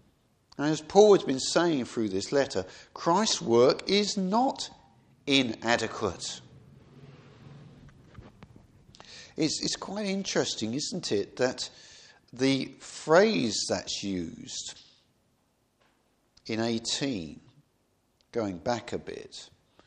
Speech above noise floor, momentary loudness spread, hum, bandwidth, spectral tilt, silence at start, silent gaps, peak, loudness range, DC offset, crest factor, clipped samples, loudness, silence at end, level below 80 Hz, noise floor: 44 dB; 17 LU; none; 10 kHz; -4 dB/octave; 0.6 s; none; -6 dBFS; 10 LU; under 0.1%; 24 dB; under 0.1%; -28 LUFS; 0.4 s; -64 dBFS; -71 dBFS